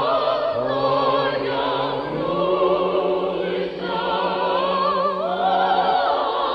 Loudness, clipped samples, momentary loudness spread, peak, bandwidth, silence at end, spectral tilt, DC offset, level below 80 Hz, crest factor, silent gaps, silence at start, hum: -21 LUFS; under 0.1%; 5 LU; -8 dBFS; 6 kHz; 0 s; -7 dB/octave; under 0.1%; -54 dBFS; 12 dB; none; 0 s; none